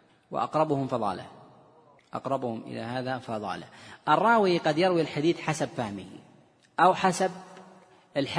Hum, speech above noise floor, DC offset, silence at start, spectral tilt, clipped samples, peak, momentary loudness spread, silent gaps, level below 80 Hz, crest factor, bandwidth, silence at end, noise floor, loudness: none; 31 dB; under 0.1%; 0.3 s; -5.5 dB/octave; under 0.1%; -8 dBFS; 17 LU; none; -70 dBFS; 20 dB; 10.5 kHz; 0 s; -58 dBFS; -27 LUFS